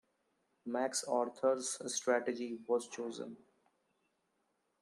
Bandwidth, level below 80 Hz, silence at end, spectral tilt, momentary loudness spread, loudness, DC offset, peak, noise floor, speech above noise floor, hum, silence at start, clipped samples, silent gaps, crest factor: 13 kHz; -90 dBFS; 1.45 s; -2 dB/octave; 10 LU; -37 LUFS; under 0.1%; -20 dBFS; -81 dBFS; 44 dB; none; 0.65 s; under 0.1%; none; 18 dB